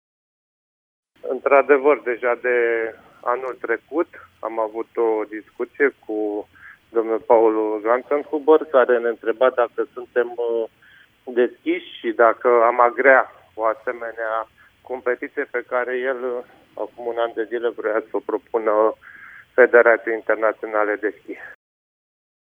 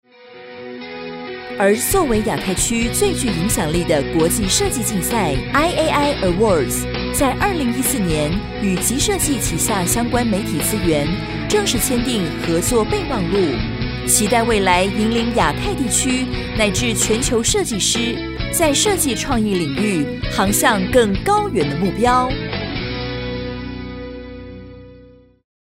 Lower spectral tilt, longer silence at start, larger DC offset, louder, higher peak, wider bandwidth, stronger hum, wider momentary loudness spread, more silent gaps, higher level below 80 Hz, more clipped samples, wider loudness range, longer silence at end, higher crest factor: first, -6 dB/octave vs -4 dB/octave; first, 1.25 s vs 0.25 s; neither; second, -20 LUFS vs -17 LUFS; about the same, -2 dBFS vs -2 dBFS; second, 3.7 kHz vs 16.5 kHz; neither; first, 15 LU vs 10 LU; neither; second, -70 dBFS vs -32 dBFS; neither; first, 6 LU vs 2 LU; first, 1 s vs 0.75 s; about the same, 20 dB vs 16 dB